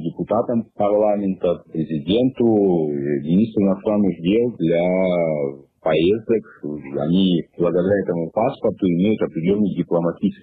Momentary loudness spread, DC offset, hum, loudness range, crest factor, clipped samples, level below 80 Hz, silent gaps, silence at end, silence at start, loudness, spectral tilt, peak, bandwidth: 6 LU; under 0.1%; none; 2 LU; 12 dB; under 0.1%; -54 dBFS; none; 0.1 s; 0 s; -20 LUFS; -11 dB/octave; -8 dBFS; 4.5 kHz